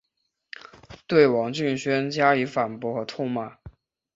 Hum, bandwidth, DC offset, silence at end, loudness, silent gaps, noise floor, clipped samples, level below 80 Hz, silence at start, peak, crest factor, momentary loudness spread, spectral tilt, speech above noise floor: none; 7.8 kHz; under 0.1%; 0.45 s; -24 LUFS; none; -77 dBFS; under 0.1%; -60 dBFS; 0.9 s; -6 dBFS; 20 dB; 23 LU; -6 dB/octave; 54 dB